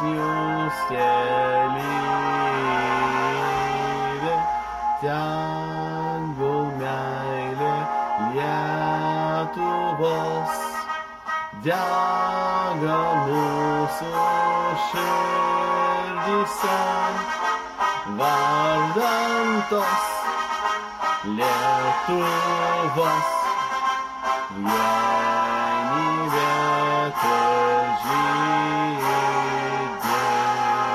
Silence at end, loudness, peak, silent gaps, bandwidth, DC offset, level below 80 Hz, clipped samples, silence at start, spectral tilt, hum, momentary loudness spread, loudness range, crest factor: 0 s; -23 LUFS; -8 dBFS; none; 15.5 kHz; under 0.1%; -56 dBFS; under 0.1%; 0 s; -4.5 dB/octave; none; 5 LU; 4 LU; 14 dB